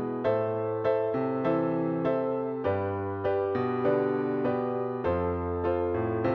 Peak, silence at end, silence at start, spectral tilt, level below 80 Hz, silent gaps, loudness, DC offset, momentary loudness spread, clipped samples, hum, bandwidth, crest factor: -14 dBFS; 0 s; 0 s; -10 dB/octave; -54 dBFS; none; -29 LUFS; under 0.1%; 3 LU; under 0.1%; none; 5.8 kHz; 14 dB